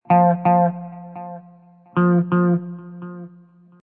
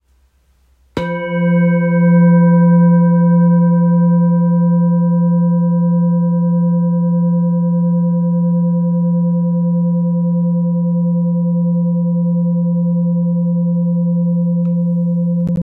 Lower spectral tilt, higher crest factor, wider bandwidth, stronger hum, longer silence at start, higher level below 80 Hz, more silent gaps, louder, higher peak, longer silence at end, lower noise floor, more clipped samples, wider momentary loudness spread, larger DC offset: about the same, -13 dB/octave vs -12 dB/octave; first, 16 dB vs 10 dB; about the same, 3.2 kHz vs 3.1 kHz; neither; second, 0.1 s vs 0.95 s; second, -70 dBFS vs -54 dBFS; neither; second, -18 LUFS vs -14 LUFS; about the same, -4 dBFS vs -2 dBFS; first, 0.55 s vs 0 s; second, -49 dBFS vs -55 dBFS; neither; first, 20 LU vs 6 LU; neither